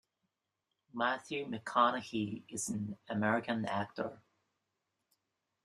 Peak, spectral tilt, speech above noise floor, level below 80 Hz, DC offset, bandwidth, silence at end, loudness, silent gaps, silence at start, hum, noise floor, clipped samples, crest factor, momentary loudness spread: -16 dBFS; -4.5 dB/octave; 52 dB; -76 dBFS; under 0.1%; 13 kHz; 1.5 s; -36 LUFS; none; 0.95 s; none; -87 dBFS; under 0.1%; 22 dB; 10 LU